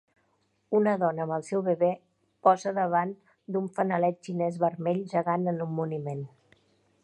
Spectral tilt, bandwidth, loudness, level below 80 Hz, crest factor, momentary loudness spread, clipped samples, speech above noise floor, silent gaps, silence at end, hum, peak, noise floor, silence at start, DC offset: -8 dB/octave; 10 kHz; -28 LUFS; -76 dBFS; 20 dB; 10 LU; under 0.1%; 44 dB; none; 0.75 s; none; -8 dBFS; -72 dBFS; 0.7 s; under 0.1%